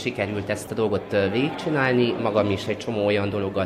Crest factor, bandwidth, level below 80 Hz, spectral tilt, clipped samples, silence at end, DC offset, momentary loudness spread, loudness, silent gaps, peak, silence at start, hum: 16 dB; 15.5 kHz; -58 dBFS; -6 dB/octave; under 0.1%; 0 s; under 0.1%; 6 LU; -24 LUFS; none; -6 dBFS; 0 s; none